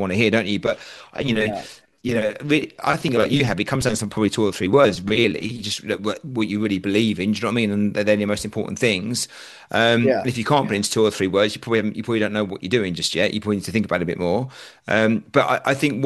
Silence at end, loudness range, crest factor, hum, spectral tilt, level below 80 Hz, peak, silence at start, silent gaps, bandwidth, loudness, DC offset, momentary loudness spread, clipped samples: 0 s; 2 LU; 20 dB; none; -5 dB/octave; -52 dBFS; -2 dBFS; 0 s; none; 12.5 kHz; -21 LUFS; under 0.1%; 7 LU; under 0.1%